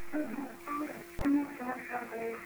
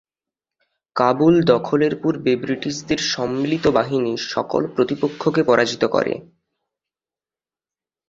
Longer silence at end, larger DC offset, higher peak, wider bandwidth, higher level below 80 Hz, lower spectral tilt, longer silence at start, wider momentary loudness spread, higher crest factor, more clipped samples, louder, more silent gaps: second, 0 s vs 1.85 s; neither; second, -20 dBFS vs -2 dBFS; first, over 20 kHz vs 7.8 kHz; about the same, -54 dBFS vs -54 dBFS; about the same, -6 dB/octave vs -5.5 dB/octave; second, 0 s vs 0.95 s; about the same, 8 LU vs 8 LU; about the same, 16 dB vs 20 dB; neither; second, -36 LUFS vs -19 LUFS; neither